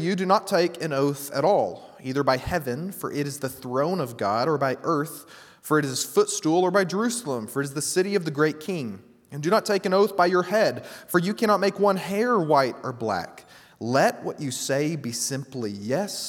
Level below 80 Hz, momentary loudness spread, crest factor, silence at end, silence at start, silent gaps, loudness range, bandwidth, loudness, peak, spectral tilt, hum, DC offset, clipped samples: -58 dBFS; 10 LU; 20 dB; 0 s; 0 s; none; 4 LU; 18.5 kHz; -24 LUFS; -4 dBFS; -4.5 dB/octave; none; under 0.1%; under 0.1%